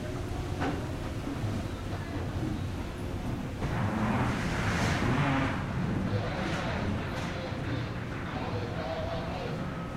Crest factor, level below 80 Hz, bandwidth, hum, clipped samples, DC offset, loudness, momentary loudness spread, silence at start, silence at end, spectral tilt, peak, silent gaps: 14 dB; -44 dBFS; 15.5 kHz; none; under 0.1%; under 0.1%; -33 LUFS; 8 LU; 0 s; 0 s; -6.5 dB/octave; -16 dBFS; none